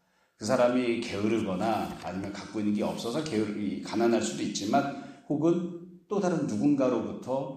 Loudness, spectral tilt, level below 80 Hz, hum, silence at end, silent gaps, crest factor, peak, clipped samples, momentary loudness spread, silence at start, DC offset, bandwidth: -29 LUFS; -5.5 dB/octave; -66 dBFS; none; 0 s; none; 18 dB; -12 dBFS; under 0.1%; 11 LU; 0.4 s; under 0.1%; 14.5 kHz